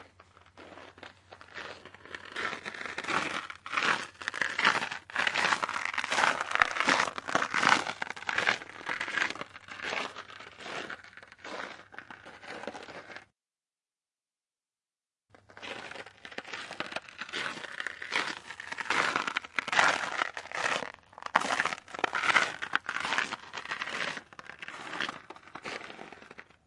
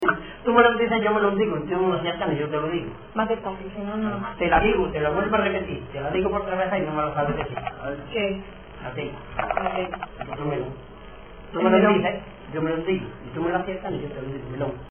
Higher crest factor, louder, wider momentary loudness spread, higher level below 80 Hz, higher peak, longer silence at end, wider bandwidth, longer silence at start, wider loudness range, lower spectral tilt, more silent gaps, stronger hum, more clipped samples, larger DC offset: first, 32 dB vs 20 dB; second, -31 LUFS vs -25 LUFS; first, 20 LU vs 14 LU; second, -74 dBFS vs -44 dBFS; about the same, -2 dBFS vs -4 dBFS; first, 0.25 s vs 0 s; first, 11.5 kHz vs 3.5 kHz; about the same, 0 s vs 0 s; first, 17 LU vs 6 LU; second, -1.5 dB/octave vs -9.5 dB/octave; neither; neither; neither; second, under 0.1% vs 0.2%